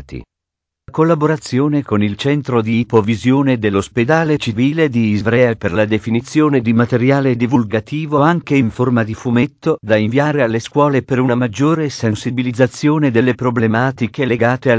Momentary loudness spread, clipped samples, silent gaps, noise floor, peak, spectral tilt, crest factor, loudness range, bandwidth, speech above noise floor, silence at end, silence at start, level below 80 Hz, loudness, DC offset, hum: 4 LU; under 0.1%; none; -81 dBFS; 0 dBFS; -7 dB/octave; 14 dB; 1 LU; 8 kHz; 67 dB; 0 s; 0 s; -44 dBFS; -15 LUFS; under 0.1%; none